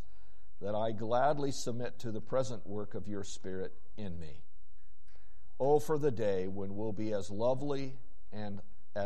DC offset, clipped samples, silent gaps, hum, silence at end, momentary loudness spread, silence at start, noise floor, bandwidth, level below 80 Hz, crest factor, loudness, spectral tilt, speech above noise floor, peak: 3%; under 0.1%; none; none; 0 s; 15 LU; 0.6 s; -62 dBFS; 11.5 kHz; -62 dBFS; 18 dB; -36 LUFS; -6 dB/octave; 26 dB; -16 dBFS